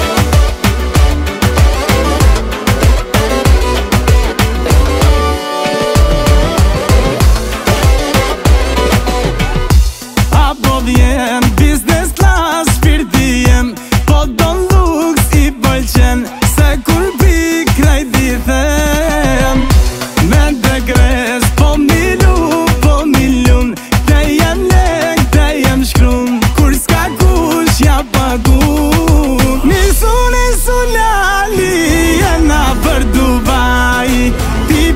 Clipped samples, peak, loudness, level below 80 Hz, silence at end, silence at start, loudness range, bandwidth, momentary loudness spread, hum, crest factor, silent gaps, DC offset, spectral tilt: under 0.1%; 0 dBFS; -11 LUFS; -12 dBFS; 0 s; 0 s; 1 LU; 16.5 kHz; 3 LU; none; 10 dB; none; under 0.1%; -5 dB/octave